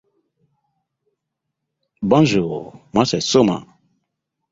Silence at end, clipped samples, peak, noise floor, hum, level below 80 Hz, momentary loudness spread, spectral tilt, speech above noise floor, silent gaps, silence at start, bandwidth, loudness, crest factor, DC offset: 0.9 s; under 0.1%; -2 dBFS; -79 dBFS; none; -54 dBFS; 13 LU; -5.5 dB/octave; 63 dB; none; 2 s; 7.8 kHz; -18 LUFS; 20 dB; under 0.1%